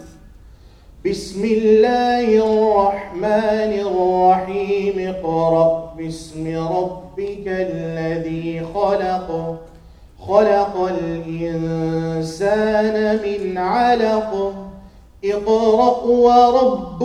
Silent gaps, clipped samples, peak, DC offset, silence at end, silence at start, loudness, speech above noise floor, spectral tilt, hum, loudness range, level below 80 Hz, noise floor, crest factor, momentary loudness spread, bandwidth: none; under 0.1%; 0 dBFS; under 0.1%; 0 s; 0 s; -18 LUFS; 26 dB; -6.5 dB/octave; none; 6 LU; -44 dBFS; -44 dBFS; 18 dB; 12 LU; 11 kHz